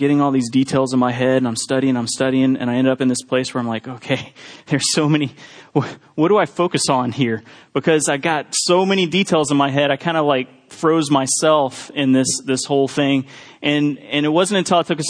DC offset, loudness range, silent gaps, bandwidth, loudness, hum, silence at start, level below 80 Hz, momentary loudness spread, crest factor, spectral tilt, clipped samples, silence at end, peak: under 0.1%; 3 LU; none; 10.5 kHz; -18 LUFS; none; 0 s; -62 dBFS; 8 LU; 16 dB; -4.5 dB/octave; under 0.1%; 0 s; -2 dBFS